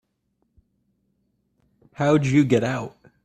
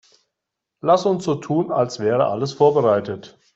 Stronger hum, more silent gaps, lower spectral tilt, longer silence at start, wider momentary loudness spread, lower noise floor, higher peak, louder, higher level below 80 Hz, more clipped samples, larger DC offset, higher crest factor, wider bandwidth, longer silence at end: neither; neither; about the same, -7 dB/octave vs -6.5 dB/octave; first, 2 s vs 0.85 s; first, 12 LU vs 8 LU; second, -72 dBFS vs -82 dBFS; about the same, -4 dBFS vs -4 dBFS; about the same, -21 LUFS vs -19 LUFS; about the same, -58 dBFS vs -62 dBFS; neither; neither; about the same, 22 dB vs 18 dB; first, 9.2 kHz vs 8 kHz; about the same, 0.35 s vs 0.25 s